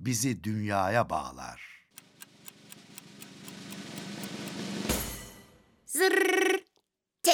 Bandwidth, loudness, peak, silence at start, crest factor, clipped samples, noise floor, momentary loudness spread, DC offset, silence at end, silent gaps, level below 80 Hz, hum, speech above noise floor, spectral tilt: over 20 kHz; -30 LUFS; -8 dBFS; 0 s; 24 dB; under 0.1%; -76 dBFS; 23 LU; under 0.1%; 0 s; none; -54 dBFS; none; 47 dB; -3.5 dB/octave